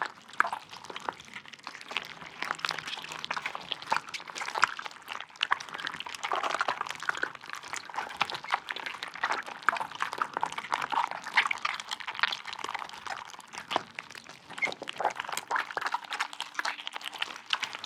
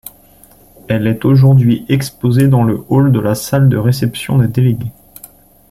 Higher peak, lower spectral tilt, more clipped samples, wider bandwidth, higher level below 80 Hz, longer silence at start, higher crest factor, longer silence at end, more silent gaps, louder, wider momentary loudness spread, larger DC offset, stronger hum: second, -4 dBFS vs 0 dBFS; second, -0.5 dB/octave vs -7.5 dB/octave; neither; about the same, 17 kHz vs 15.5 kHz; second, -78 dBFS vs -42 dBFS; second, 0 s vs 0.9 s; first, 30 dB vs 12 dB; second, 0 s vs 0.8 s; neither; second, -33 LUFS vs -12 LUFS; first, 11 LU vs 8 LU; neither; neither